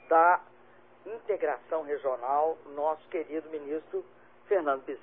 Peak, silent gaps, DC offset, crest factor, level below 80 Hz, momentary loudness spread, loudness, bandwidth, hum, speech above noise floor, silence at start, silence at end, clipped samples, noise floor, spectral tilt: -12 dBFS; none; under 0.1%; 20 dB; -82 dBFS; 14 LU; -30 LUFS; 3.8 kHz; 60 Hz at -65 dBFS; 26 dB; 0.1 s; 0.05 s; under 0.1%; -58 dBFS; -8 dB/octave